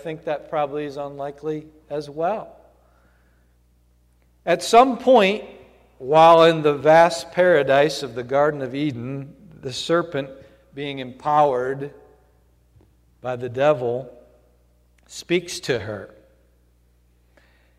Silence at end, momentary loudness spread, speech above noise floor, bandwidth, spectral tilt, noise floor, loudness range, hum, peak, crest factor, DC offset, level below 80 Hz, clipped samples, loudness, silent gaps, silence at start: 1.7 s; 19 LU; 39 dB; 14.5 kHz; -5 dB/octave; -59 dBFS; 14 LU; 60 Hz at -55 dBFS; -2 dBFS; 20 dB; under 0.1%; -58 dBFS; under 0.1%; -20 LUFS; none; 0.05 s